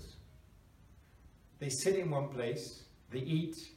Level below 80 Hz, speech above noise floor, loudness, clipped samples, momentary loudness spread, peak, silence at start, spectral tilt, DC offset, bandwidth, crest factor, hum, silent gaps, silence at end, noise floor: -64 dBFS; 25 dB; -37 LUFS; under 0.1%; 21 LU; -20 dBFS; 0 s; -5 dB/octave; under 0.1%; 16.5 kHz; 20 dB; none; none; 0 s; -61 dBFS